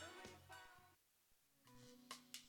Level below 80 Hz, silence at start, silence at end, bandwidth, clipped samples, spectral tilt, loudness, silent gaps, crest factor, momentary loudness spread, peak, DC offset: -84 dBFS; 0 s; 0 s; 19 kHz; under 0.1%; -2 dB/octave; -61 LUFS; none; 28 dB; 12 LU; -34 dBFS; under 0.1%